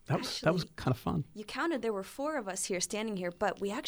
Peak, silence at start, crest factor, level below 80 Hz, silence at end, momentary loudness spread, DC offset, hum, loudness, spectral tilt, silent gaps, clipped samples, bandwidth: -16 dBFS; 0.1 s; 18 dB; -60 dBFS; 0 s; 5 LU; under 0.1%; none; -34 LUFS; -4.5 dB/octave; none; under 0.1%; over 20 kHz